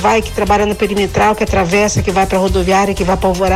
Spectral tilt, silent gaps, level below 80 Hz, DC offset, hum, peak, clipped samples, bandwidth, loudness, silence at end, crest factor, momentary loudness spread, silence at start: -5 dB/octave; none; -26 dBFS; under 0.1%; none; -2 dBFS; under 0.1%; 16 kHz; -13 LUFS; 0 s; 12 dB; 2 LU; 0 s